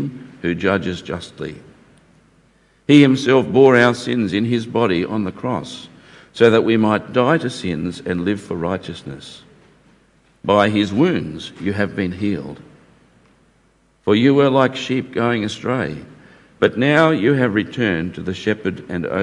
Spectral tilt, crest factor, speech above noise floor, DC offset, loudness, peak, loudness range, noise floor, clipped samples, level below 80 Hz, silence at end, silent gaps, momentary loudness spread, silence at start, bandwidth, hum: -6.5 dB/octave; 18 dB; 40 dB; under 0.1%; -18 LUFS; 0 dBFS; 6 LU; -58 dBFS; under 0.1%; -56 dBFS; 0 s; none; 16 LU; 0 s; 11 kHz; none